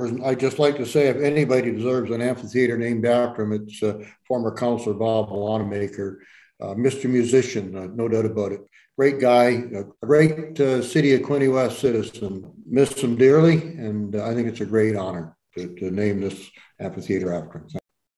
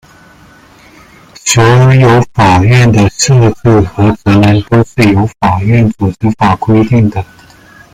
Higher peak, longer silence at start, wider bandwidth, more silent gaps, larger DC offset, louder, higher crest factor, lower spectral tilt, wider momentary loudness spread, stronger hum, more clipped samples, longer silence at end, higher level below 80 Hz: second, -4 dBFS vs 0 dBFS; second, 0 s vs 1.45 s; second, 12.5 kHz vs 14 kHz; neither; neither; second, -22 LUFS vs -8 LUFS; first, 18 dB vs 8 dB; about the same, -6.5 dB/octave vs -6 dB/octave; first, 15 LU vs 6 LU; neither; neither; second, 0.4 s vs 0.7 s; second, -62 dBFS vs -34 dBFS